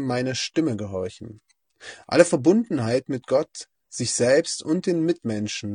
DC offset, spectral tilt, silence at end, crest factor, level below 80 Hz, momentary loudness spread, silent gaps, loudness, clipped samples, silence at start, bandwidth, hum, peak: under 0.1%; -4.5 dB/octave; 0 s; 24 dB; -66 dBFS; 20 LU; none; -23 LUFS; under 0.1%; 0 s; 10 kHz; none; 0 dBFS